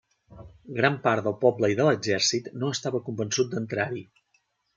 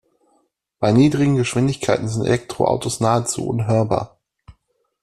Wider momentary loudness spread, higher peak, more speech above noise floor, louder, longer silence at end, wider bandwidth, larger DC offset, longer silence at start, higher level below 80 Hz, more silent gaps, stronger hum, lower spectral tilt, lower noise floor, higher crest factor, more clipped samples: about the same, 8 LU vs 7 LU; second, -6 dBFS vs -2 dBFS; about the same, 45 dB vs 47 dB; second, -25 LUFS vs -19 LUFS; first, 0.75 s vs 0.5 s; second, 9.4 kHz vs 13 kHz; neither; second, 0.3 s vs 0.8 s; second, -64 dBFS vs -50 dBFS; neither; neither; second, -4 dB/octave vs -6 dB/octave; first, -71 dBFS vs -65 dBFS; about the same, 20 dB vs 18 dB; neither